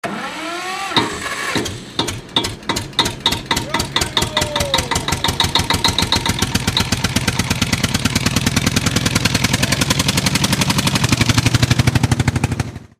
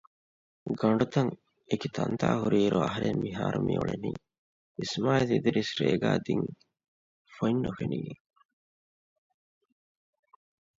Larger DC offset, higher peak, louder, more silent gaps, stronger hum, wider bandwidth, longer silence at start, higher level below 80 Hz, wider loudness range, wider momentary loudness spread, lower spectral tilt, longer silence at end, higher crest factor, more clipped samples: neither; first, 0 dBFS vs -10 dBFS; first, -17 LUFS vs -29 LUFS; second, none vs 4.38-4.75 s, 6.88-7.25 s; neither; first, 16 kHz vs 7.8 kHz; second, 0.05 s vs 0.65 s; first, -32 dBFS vs -60 dBFS; second, 4 LU vs 8 LU; second, 7 LU vs 12 LU; second, -3.5 dB/octave vs -6.5 dB/octave; second, 0.15 s vs 2.65 s; about the same, 16 dB vs 20 dB; neither